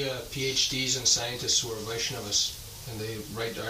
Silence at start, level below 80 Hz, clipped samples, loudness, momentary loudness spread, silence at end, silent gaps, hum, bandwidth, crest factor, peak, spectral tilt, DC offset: 0 s; -52 dBFS; under 0.1%; -27 LUFS; 12 LU; 0 s; none; none; 15.5 kHz; 22 dB; -8 dBFS; -1.5 dB/octave; under 0.1%